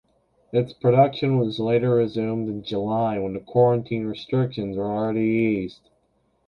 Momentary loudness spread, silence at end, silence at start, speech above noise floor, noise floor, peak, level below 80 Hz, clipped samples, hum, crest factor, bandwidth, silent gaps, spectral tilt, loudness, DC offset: 9 LU; 0.75 s; 0.55 s; 45 dB; -67 dBFS; -6 dBFS; -56 dBFS; under 0.1%; none; 18 dB; 6.2 kHz; none; -9.5 dB/octave; -23 LUFS; under 0.1%